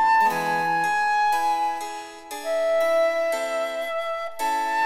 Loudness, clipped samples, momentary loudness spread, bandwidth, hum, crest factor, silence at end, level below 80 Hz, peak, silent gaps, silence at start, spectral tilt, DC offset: -23 LUFS; under 0.1%; 10 LU; 16.5 kHz; none; 12 dB; 0 s; -66 dBFS; -10 dBFS; none; 0 s; -2.5 dB/octave; under 0.1%